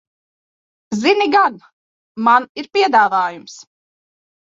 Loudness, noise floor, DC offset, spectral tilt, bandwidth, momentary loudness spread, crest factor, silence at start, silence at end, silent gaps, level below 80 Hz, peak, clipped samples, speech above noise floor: -15 LUFS; under -90 dBFS; under 0.1%; -4 dB/octave; 7.6 kHz; 12 LU; 16 dB; 0.9 s; 0.95 s; 1.73-2.15 s, 2.49-2.55 s; -68 dBFS; -2 dBFS; under 0.1%; over 74 dB